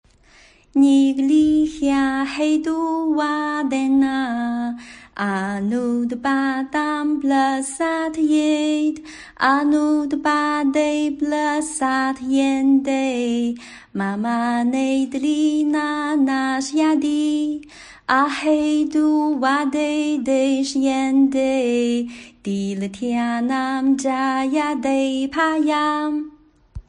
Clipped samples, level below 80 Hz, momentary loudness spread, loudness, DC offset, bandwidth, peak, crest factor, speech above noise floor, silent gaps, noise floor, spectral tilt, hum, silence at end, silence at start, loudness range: under 0.1%; -54 dBFS; 7 LU; -20 LUFS; under 0.1%; 10.5 kHz; -4 dBFS; 16 dB; 32 dB; none; -51 dBFS; -4.5 dB/octave; none; 0.1 s; 0.75 s; 3 LU